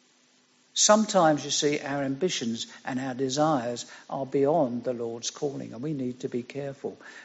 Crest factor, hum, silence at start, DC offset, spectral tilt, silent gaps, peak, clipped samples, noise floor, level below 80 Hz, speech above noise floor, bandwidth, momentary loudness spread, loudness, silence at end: 22 dB; none; 0.75 s; under 0.1%; -4 dB/octave; none; -6 dBFS; under 0.1%; -63 dBFS; -72 dBFS; 36 dB; 8 kHz; 15 LU; -27 LUFS; 0 s